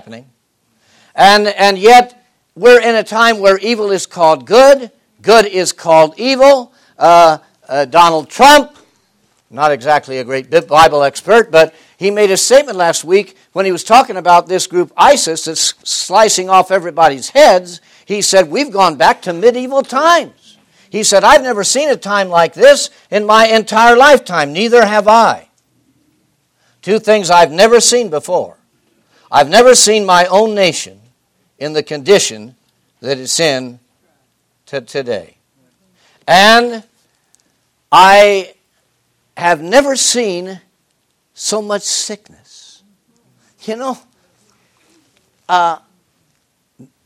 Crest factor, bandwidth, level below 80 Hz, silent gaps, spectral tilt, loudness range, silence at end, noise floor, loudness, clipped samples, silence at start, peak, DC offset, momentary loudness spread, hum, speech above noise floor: 12 dB; 17 kHz; -50 dBFS; none; -2.5 dB/octave; 11 LU; 1.3 s; -63 dBFS; -10 LUFS; 1%; 0.1 s; 0 dBFS; under 0.1%; 15 LU; none; 53 dB